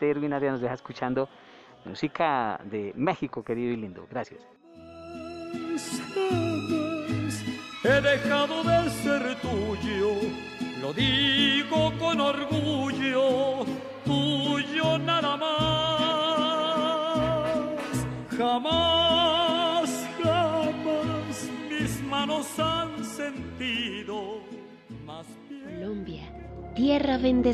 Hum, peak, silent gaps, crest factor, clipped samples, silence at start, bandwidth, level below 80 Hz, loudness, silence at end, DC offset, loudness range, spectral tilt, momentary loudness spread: none; -10 dBFS; none; 18 dB; under 0.1%; 0 s; 14.5 kHz; -52 dBFS; -27 LUFS; 0 s; under 0.1%; 8 LU; -5 dB/octave; 15 LU